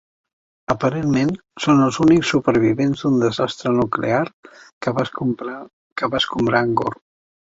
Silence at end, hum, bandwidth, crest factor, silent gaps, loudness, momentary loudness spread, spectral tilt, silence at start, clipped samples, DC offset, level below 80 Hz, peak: 0.65 s; none; 8 kHz; 18 dB; 4.33-4.43 s, 4.73-4.81 s, 5.73-5.96 s; -19 LUFS; 12 LU; -6 dB/octave; 0.7 s; under 0.1%; under 0.1%; -50 dBFS; -2 dBFS